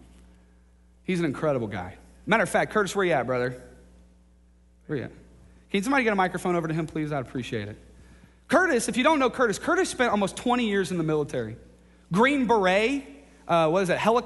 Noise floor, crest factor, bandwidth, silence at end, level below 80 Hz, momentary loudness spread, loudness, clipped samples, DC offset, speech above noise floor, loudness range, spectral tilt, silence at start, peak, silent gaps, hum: -57 dBFS; 18 dB; 11.5 kHz; 0 s; -54 dBFS; 12 LU; -25 LUFS; under 0.1%; under 0.1%; 33 dB; 5 LU; -5 dB/octave; 1.1 s; -8 dBFS; none; none